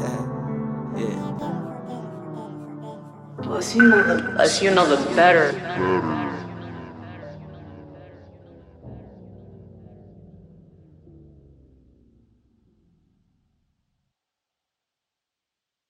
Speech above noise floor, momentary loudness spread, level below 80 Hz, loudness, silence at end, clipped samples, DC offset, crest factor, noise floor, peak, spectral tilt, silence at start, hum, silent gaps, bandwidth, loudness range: 69 dB; 26 LU; -58 dBFS; -20 LUFS; 5.8 s; under 0.1%; under 0.1%; 22 dB; -87 dBFS; -2 dBFS; -4.5 dB/octave; 0 s; none; none; 12.5 kHz; 23 LU